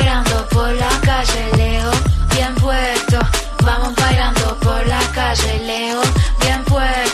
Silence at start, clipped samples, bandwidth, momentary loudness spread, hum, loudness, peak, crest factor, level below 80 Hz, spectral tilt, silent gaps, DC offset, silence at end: 0 s; under 0.1%; 13.5 kHz; 2 LU; none; -16 LUFS; -2 dBFS; 14 dB; -18 dBFS; -4.5 dB/octave; none; under 0.1%; 0 s